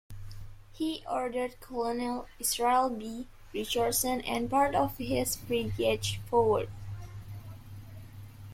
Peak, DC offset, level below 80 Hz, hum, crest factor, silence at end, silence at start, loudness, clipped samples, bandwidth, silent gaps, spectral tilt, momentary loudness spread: -14 dBFS; under 0.1%; -50 dBFS; none; 18 dB; 0 s; 0.1 s; -30 LUFS; under 0.1%; 16.5 kHz; none; -4 dB/octave; 21 LU